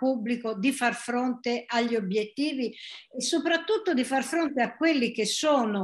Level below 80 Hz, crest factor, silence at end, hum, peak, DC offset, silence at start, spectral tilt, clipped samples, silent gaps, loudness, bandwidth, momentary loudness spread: -76 dBFS; 16 dB; 0 s; none; -10 dBFS; under 0.1%; 0 s; -3.5 dB/octave; under 0.1%; none; -27 LUFS; 12.5 kHz; 6 LU